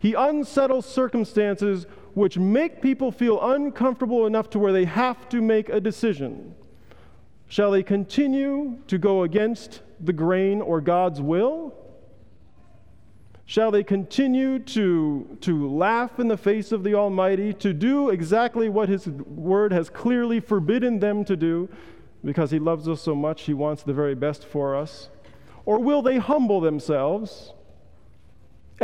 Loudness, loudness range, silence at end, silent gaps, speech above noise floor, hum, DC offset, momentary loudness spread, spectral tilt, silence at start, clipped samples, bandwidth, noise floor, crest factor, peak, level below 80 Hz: -23 LUFS; 4 LU; 0 s; none; 32 dB; none; 0.4%; 8 LU; -7.5 dB/octave; 0 s; under 0.1%; 11 kHz; -54 dBFS; 16 dB; -8 dBFS; -60 dBFS